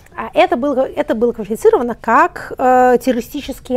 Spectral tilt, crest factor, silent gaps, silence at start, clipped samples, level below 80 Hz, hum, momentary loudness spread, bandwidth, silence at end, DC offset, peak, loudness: -5 dB/octave; 14 dB; none; 0.15 s; under 0.1%; -42 dBFS; none; 8 LU; 16 kHz; 0 s; under 0.1%; 0 dBFS; -15 LUFS